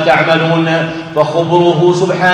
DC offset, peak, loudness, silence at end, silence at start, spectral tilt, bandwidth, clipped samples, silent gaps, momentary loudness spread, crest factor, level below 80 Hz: under 0.1%; 0 dBFS; -11 LUFS; 0 s; 0 s; -6 dB/octave; 9.8 kHz; under 0.1%; none; 6 LU; 10 dB; -50 dBFS